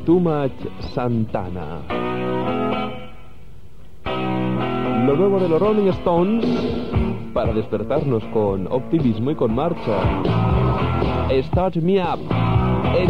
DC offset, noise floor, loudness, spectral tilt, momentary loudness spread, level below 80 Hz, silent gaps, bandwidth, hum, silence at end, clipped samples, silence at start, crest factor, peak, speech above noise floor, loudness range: 2%; -45 dBFS; -20 LUFS; -9 dB/octave; 8 LU; -34 dBFS; none; 6.6 kHz; none; 0 s; under 0.1%; 0 s; 14 dB; -6 dBFS; 25 dB; 6 LU